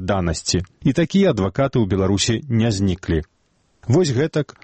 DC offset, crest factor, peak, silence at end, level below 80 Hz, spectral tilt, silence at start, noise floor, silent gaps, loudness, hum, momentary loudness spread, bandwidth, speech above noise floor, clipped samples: under 0.1%; 14 dB; -6 dBFS; 0.2 s; -40 dBFS; -5.5 dB/octave; 0 s; -62 dBFS; none; -19 LUFS; none; 5 LU; 8.8 kHz; 44 dB; under 0.1%